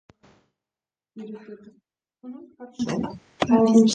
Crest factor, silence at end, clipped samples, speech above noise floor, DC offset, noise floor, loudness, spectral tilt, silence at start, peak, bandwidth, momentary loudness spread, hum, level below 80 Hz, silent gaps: 20 dB; 0 s; under 0.1%; over 67 dB; under 0.1%; under -90 dBFS; -22 LUFS; -5.5 dB/octave; 1.15 s; -6 dBFS; 9.2 kHz; 27 LU; none; -60 dBFS; none